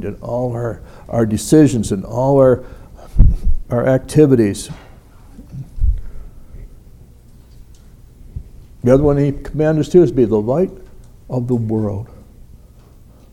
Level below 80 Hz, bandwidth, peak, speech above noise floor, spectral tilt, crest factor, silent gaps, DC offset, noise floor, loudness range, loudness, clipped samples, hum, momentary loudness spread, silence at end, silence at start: -24 dBFS; 14.5 kHz; 0 dBFS; 28 dB; -7.5 dB/octave; 16 dB; none; under 0.1%; -43 dBFS; 15 LU; -16 LUFS; under 0.1%; none; 22 LU; 0.75 s; 0 s